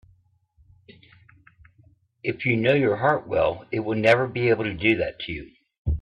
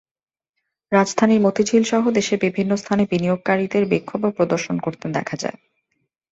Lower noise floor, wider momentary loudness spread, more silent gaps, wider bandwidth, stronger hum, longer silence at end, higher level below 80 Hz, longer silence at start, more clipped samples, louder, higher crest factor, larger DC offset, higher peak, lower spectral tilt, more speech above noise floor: second, -62 dBFS vs -78 dBFS; first, 13 LU vs 8 LU; first, 5.78-5.85 s vs none; first, 10 kHz vs 8 kHz; neither; second, 0 s vs 0.8 s; first, -42 dBFS vs -60 dBFS; first, 2.25 s vs 0.9 s; neither; second, -23 LUFS vs -20 LUFS; about the same, 20 dB vs 18 dB; neither; second, -6 dBFS vs -2 dBFS; first, -7.5 dB/octave vs -5.5 dB/octave; second, 39 dB vs 59 dB